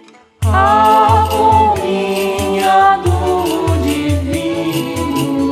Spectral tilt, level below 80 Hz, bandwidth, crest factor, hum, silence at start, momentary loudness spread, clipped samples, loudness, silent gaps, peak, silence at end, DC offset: -5.5 dB/octave; -30 dBFS; 15 kHz; 12 dB; none; 0.4 s; 8 LU; under 0.1%; -13 LUFS; none; 0 dBFS; 0 s; under 0.1%